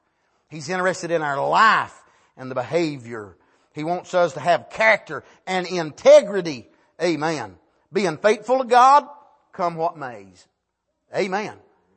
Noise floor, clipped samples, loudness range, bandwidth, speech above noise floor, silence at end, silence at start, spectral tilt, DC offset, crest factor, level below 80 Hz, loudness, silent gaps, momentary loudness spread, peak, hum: -76 dBFS; under 0.1%; 3 LU; 8.8 kHz; 56 dB; 0.4 s; 0.5 s; -4.5 dB/octave; under 0.1%; 18 dB; -70 dBFS; -20 LUFS; none; 21 LU; -2 dBFS; none